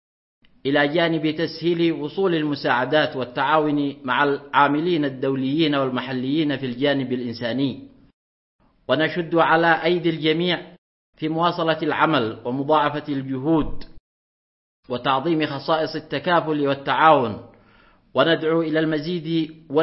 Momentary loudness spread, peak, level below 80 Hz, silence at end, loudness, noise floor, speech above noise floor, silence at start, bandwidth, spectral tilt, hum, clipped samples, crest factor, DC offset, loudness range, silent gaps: 8 LU; 0 dBFS; -50 dBFS; 0 s; -21 LUFS; -55 dBFS; 34 dB; 0.65 s; 5.8 kHz; -9.5 dB/octave; none; under 0.1%; 20 dB; under 0.1%; 4 LU; 8.13-8.59 s, 10.78-11.13 s, 14.00-14.83 s